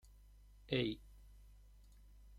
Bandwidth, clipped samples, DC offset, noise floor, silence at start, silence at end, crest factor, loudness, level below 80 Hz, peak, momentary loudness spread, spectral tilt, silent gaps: 16 kHz; under 0.1%; under 0.1%; -62 dBFS; 0.05 s; 0 s; 26 dB; -41 LUFS; -60 dBFS; -20 dBFS; 27 LU; -7 dB/octave; none